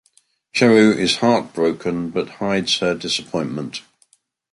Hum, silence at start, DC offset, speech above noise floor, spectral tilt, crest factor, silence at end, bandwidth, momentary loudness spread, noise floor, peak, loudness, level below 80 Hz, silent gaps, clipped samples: none; 0.55 s; under 0.1%; 42 dB; -4.5 dB/octave; 18 dB; 0.7 s; 11.5 kHz; 12 LU; -60 dBFS; -2 dBFS; -18 LUFS; -56 dBFS; none; under 0.1%